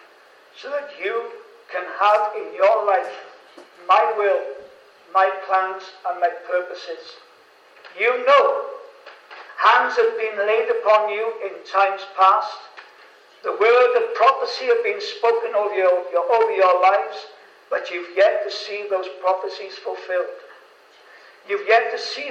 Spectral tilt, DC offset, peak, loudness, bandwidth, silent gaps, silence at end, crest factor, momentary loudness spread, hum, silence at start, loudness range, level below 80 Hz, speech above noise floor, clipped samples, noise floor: -1.5 dB/octave; under 0.1%; -2 dBFS; -20 LUFS; 8.2 kHz; none; 0 s; 20 dB; 16 LU; none; 0.55 s; 5 LU; -84 dBFS; 31 dB; under 0.1%; -51 dBFS